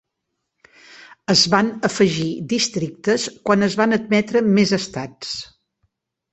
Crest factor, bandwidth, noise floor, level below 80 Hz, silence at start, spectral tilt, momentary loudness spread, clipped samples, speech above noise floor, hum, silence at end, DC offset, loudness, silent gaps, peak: 18 dB; 8.4 kHz; -77 dBFS; -58 dBFS; 1.3 s; -4 dB/octave; 13 LU; under 0.1%; 59 dB; none; 0.9 s; under 0.1%; -19 LUFS; none; -2 dBFS